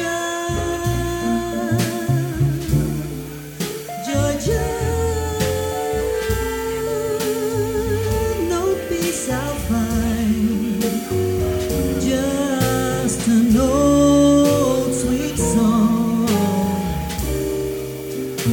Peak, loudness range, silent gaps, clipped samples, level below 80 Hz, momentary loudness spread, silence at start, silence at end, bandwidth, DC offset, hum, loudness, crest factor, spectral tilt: -4 dBFS; 6 LU; none; under 0.1%; -32 dBFS; 8 LU; 0 s; 0 s; 19.5 kHz; under 0.1%; none; -20 LUFS; 16 dB; -5.5 dB/octave